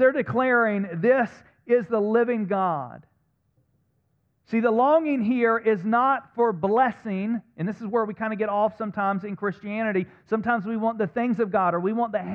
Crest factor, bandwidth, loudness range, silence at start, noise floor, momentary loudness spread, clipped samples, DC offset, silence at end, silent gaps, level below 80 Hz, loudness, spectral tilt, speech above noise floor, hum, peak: 16 dB; 6.2 kHz; 4 LU; 0 s; -70 dBFS; 8 LU; under 0.1%; under 0.1%; 0 s; none; -68 dBFS; -24 LUFS; -9 dB/octave; 46 dB; none; -8 dBFS